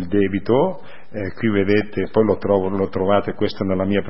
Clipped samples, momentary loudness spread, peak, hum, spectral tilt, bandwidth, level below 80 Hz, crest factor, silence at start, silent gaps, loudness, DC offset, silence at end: under 0.1%; 8 LU; -2 dBFS; none; -11 dB/octave; 5.8 kHz; -50 dBFS; 18 dB; 0 s; none; -20 LUFS; 3%; 0 s